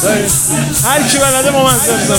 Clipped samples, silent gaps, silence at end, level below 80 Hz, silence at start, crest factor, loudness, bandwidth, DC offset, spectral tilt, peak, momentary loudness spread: under 0.1%; none; 0 s; -36 dBFS; 0 s; 12 dB; -10 LUFS; 18.5 kHz; under 0.1%; -3 dB/octave; 0 dBFS; 2 LU